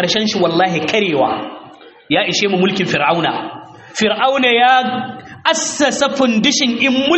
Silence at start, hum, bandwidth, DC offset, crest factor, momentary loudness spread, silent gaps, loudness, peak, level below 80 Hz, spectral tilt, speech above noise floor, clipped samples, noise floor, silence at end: 0 s; none; 8.4 kHz; under 0.1%; 16 dB; 12 LU; none; -14 LUFS; 0 dBFS; -58 dBFS; -3.5 dB/octave; 24 dB; under 0.1%; -39 dBFS; 0 s